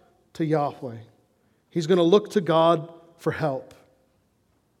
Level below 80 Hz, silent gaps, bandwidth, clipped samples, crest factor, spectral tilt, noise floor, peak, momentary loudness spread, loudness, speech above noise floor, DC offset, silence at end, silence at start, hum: -72 dBFS; none; 13.5 kHz; under 0.1%; 20 dB; -6.5 dB/octave; -67 dBFS; -4 dBFS; 19 LU; -23 LUFS; 44 dB; under 0.1%; 1.15 s; 0.4 s; none